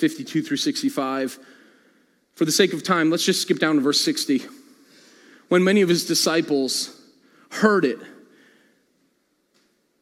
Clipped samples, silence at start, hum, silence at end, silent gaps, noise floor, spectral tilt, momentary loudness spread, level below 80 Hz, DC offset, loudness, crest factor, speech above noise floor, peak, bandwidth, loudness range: under 0.1%; 0 s; none; 1.9 s; none; -68 dBFS; -3.5 dB/octave; 9 LU; -80 dBFS; under 0.1%; -21 LUFS; 20 dB; 47 dB; -2 dBFS; 16.5 kHz; 4 LU